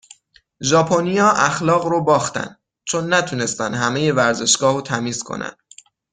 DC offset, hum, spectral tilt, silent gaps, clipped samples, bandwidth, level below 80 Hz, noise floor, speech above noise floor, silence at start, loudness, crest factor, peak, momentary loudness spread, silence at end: under 0.1%; none; -3.5 dB/octave; none; under 0.1%; 9.6 kHz; -58 dBFS; -49 dBFS; 31 dB; 0.6 s; -18 LUFS; 18 dB; -2 dBFS; 13 LU; 0.6 s